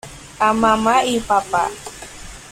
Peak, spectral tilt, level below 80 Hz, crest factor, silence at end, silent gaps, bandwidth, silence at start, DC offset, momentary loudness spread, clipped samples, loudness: -4 dBFS; -3.5 dB/octave; -44 dBFS; 16 dB; 0 s; none; 16 kHz; 0.05 s; under 0.1%; 20 LU; under 0.1%; -17 LUFS